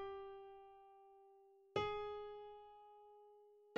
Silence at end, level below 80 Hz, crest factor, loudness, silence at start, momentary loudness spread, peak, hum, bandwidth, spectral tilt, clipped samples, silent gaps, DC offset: 0 s; -74 dBFS; 24 dB; -48 LUFS; 0 s; 23 LU; -26 dBFS; none; 7.6 kHz; -2.5 dB/octave; under 0.1%; none; under 0.1%